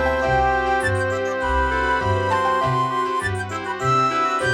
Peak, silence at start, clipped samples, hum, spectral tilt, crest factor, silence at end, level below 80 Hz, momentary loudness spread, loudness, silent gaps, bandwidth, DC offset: -6 dBFS; 0 s; under 0.1%; none; -5.5 dB/octave; 14 dB; 0 s; -34 dBFS; 5 LU; -20 LUFS; none; 14 kHz; under 0.1%